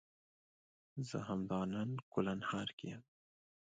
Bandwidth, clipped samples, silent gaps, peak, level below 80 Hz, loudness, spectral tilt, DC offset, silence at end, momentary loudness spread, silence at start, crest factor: 9 kHz; under 0.1%; 2.03-2.12 s, 2.73-2.78 s; -22 dBFS; -72 dBFS; -42 LUFS; -6.5 dB/octave; under 0.1%; 0.65 s; 11 LU; 0.95 s; 20 dB